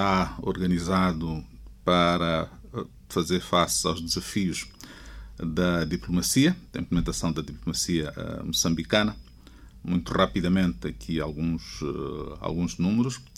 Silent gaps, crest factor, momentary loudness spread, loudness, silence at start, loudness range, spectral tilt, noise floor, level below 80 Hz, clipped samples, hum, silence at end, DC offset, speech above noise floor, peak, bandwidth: none; 22 dB; 13 LU; -27 LUFS; 0 s; 2 LU; -4.5 dB/octave; -49 dBFS; -44 dBFS; under 0.1%; none; 0.1 s; under 0.1%; 23 dB; -6 dBFS; 16 kHz